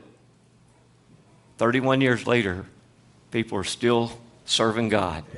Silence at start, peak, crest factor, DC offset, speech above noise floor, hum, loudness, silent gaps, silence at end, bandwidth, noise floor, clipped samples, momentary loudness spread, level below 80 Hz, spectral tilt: 1.6 s; -4 dBFS; 22 dB; under 0.1%; 34 dB; none; -24 LUFS; none; 0 s; 11.5 kHz; -57 dBFS; under 0.1%; 10 LU; -58 dBFS; -4.5 dB/octave